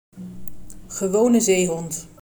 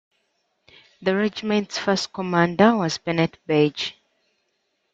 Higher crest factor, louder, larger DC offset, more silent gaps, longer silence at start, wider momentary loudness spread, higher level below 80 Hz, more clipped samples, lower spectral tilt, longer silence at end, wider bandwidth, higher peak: second, 14 dB vs 20 dB; about the same, -20 LUFS vs -22 LUFS; neither; neither; second, 0.1 s vs 1 s; first, 21 LU vs 7 LU; first, -52 dBFS vs -64 dBFS; neither; about the same, -4.5 dB/octave vs -5.5 dB/octave; second, 0 s vs 1.05 s; first, over 20 kHz vs 7.8 kHz; second, -8 dBFS vs -4 dBFS